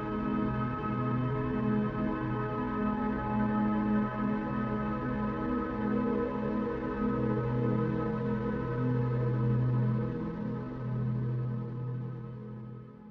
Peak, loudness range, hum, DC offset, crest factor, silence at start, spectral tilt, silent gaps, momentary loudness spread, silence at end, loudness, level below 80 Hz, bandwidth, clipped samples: -18 dBFS; 2 LU; none; under 0.1%; 14 dB; 0 s; -10.5 dB/octave; none; 7 LU; 0 s; -32 LUFS; -48 dBFS; 4.9 kHz; under 0.1%